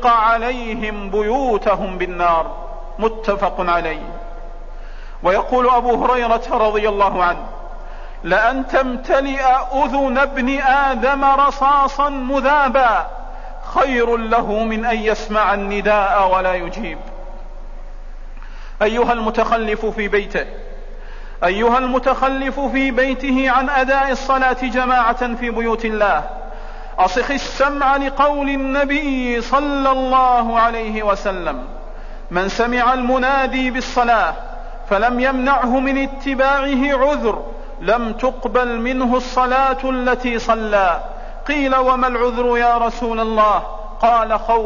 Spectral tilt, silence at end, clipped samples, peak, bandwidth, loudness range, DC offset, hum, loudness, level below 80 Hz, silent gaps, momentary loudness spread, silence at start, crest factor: -5 dB/octave; 0 s; under 0.1%; -4 dBFS; 7.4 kHz; 4 LU; 0.7%; none; -17 LUFS; -30 dBFS; none; 15 LU; 0 s; 12 dB